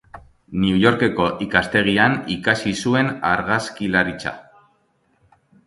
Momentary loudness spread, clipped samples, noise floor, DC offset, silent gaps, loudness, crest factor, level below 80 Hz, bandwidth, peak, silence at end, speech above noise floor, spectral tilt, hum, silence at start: 7 LU; under 0.1%; -63 dBFS; under 0.1%; none; -19 LUFS; 20 dB; -48 dBFS; 11.5 kHz; 0 dBFS; 1.25 s; 44 dB; -5.5 dB/octave; none; 0.15 s